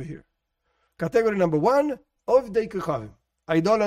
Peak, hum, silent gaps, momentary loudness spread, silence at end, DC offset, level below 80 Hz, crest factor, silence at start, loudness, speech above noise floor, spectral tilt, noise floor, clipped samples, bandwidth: -8 dBFS; none; none; 14 LU; 0 s; under 0.1%; -56 dBFS; 16 dB; 0 s; -24 LUFS; 52 dB; -7 dB/octave; -74 dBFS; under 0.1%; 15 kHz